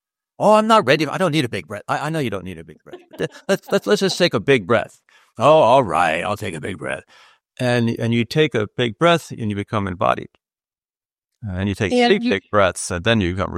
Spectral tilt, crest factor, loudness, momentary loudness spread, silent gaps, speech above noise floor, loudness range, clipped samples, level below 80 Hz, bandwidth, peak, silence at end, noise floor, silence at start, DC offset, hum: -5 dB/octave; 18 dB; -19 LUFS; 13 LU; 11.18-11.22 s; over 71 dB; 5 LU; under 0.1%; -50 dBFS; 15.5 kHz; -2 dBFS; 0 s; under -90 dBFS; 0.4 s; under 0.1%; none